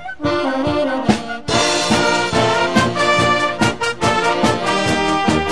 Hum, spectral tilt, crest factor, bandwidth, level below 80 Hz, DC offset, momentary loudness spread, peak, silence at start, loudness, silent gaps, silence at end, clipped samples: none; -4 dB/octave; 16 dB; 11 kHz; -40 dBFS; 1%; 4 LU; 0 dBFS; 0 s; -16 LUFS; none; 0 s; under 0.1%